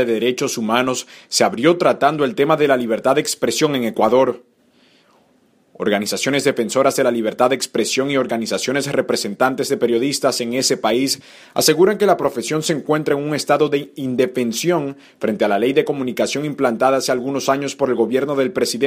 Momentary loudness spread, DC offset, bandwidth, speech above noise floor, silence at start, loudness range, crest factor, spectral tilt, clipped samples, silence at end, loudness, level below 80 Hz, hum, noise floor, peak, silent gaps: 6 LU; under 0.1%; 15.5 kHz; 39 dB; 0 s; 3 LU; 18 dB; -4 dB/octave; under 0.1%; 0 s; -18 LUFS; -62 dBFS; none; -57 dBFS; 0 dBFS; none